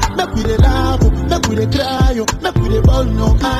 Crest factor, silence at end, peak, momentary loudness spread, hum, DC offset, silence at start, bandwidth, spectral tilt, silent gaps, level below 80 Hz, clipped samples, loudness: 12 dB; 0 s; -2 dBFS; 4 LU; none; under 0.1%; 0 s; 14.5 kHz; -6 dB/octave; none; -16 dBFS; under 0.1%; -15 LUFS